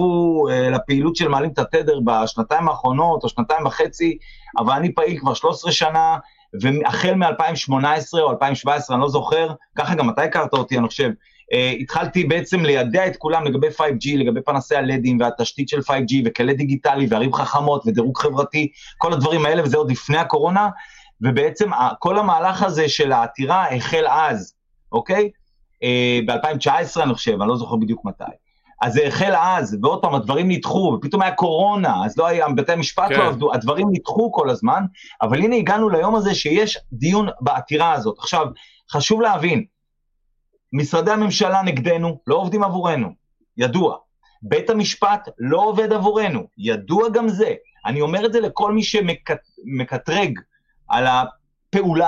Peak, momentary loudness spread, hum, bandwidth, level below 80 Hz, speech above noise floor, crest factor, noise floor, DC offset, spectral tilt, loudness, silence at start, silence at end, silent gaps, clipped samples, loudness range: -4 dBFS; 6 LU; none; 7.8 kHz; -52 dBFS; 51 dB; 16 dB; -70 dBFS; under 0.1%; -5.5 dB/octave; -19 LUFS; 0 s; 0 s; none; under 0.1%; 2 LU